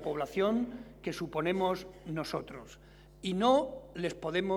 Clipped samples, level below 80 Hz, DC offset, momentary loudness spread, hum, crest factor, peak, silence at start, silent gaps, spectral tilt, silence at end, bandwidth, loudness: under 0.1%; -58 dBFS; under 0.1%; 14 LU; none; 20 dB; -14 dBFS; 0 s; none; -6 dB/octave; 0 s; 18 kHz; -33 LUFS